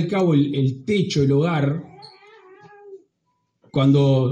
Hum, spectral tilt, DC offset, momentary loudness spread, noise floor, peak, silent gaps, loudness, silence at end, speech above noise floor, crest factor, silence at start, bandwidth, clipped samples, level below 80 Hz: none; -7.5 dB/octave; under 0.1%; 8 LU; -72 dBFS; -6 dBFS; none; -20 LUFS; 0 s; 54 dB; 14 dB; 0 s; 8 kHz; under 0.1%; -58 dBFS